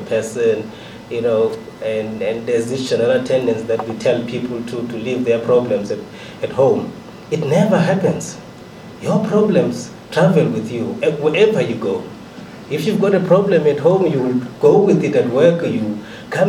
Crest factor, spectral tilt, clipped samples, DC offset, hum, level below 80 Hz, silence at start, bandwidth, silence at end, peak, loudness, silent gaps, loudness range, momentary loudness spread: 16 dB; -6.5 dB/octave; under 0.1%; under 0.1%; none; -56 dBFS; 0 s; 14.5 kHz; 0 s; 0 dBFS; -17 LUFS; none; 4 LU; 14 LU